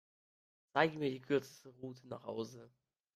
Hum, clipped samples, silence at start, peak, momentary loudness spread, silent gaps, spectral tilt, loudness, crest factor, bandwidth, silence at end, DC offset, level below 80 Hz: none; under 0.1%; 0.75 s; -18 dBFS; 17 LU; none; -6 dB/octave; -38 LUFS; 24 dB; 14.5 kHz; 0.5 s; under 0.1%; -82 dBFS